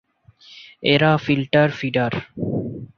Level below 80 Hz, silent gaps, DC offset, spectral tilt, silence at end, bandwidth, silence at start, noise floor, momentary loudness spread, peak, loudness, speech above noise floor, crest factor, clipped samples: -54 dBFS; none; under 0.1%; -7.5 dB/octave; 0.1 s; 6.8 kHz; 0.5 s; -50 dBFS; 10 LU; -2 dBFS; -20 LUFS; 32 dB; 20 dB; under 0.1%